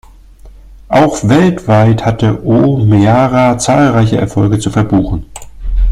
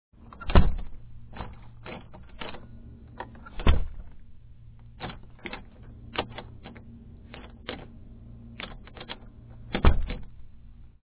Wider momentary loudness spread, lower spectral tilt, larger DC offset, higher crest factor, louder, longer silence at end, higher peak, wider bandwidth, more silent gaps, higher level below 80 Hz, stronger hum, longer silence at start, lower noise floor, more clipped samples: second, 6 LU vs 25 LU; second, -7 dB/octave vs -10 dB/octave; neither; second, 10 dB vs 24 dB; first, -10 LUFS vs -32 LUFS; second, 0 s vs 0.2 s; first, 0 dBFS vs -4 dBFS; first, 12 kHz vs 4 kHz; neither; first, -24 dBFS vs -32 dBFS; neither; about the same, 0.45 s vs 0.4 s; second, -35 dBFS vs -47 dBFS; neither